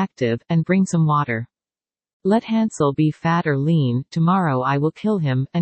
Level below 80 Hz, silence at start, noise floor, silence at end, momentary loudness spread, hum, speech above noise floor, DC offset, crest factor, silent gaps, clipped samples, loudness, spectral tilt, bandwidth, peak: -60 dBFS; 0 s; under -90 dBFS; 0 s; 4 LU; none; over 71 dB; under 0.1%; 14 dB; 2.13-2.20 s; under 0.1%; -20 LUFS; -7.5 dB/octave; 8.8 kHz; -4 dBFS